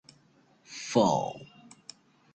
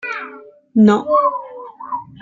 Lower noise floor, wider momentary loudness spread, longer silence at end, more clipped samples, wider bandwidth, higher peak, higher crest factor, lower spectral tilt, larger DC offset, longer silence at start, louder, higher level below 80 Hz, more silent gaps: first, -64 dBFS vs -39 dBFS; first, 25 LU vs 21 LU; first, 0.9 s vs 0.2 s; neither; first, 9.4 kHz vs 7.4 kHz; second, -10 dBFS vs -2 dBFS; first, 22 dB vs 16 dB; second, -5 dB/octave vs -7.5 dB/octave; neither; first, 0.7 s vs 0.05 s; second, -28 LUFS vs -15 LUFS; second, -68 dBFS vs -62 dBFS; neither